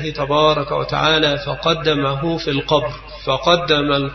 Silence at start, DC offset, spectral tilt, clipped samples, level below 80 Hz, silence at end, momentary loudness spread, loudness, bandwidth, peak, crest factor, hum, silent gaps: 0 s; under 0.1%; -5.5 dB/octave; under 0.1%; -40 dBFS; 0 s; 6 LU; -17 LUFS; 6.4 kHz; 0 dBFS; 16 dB; none; none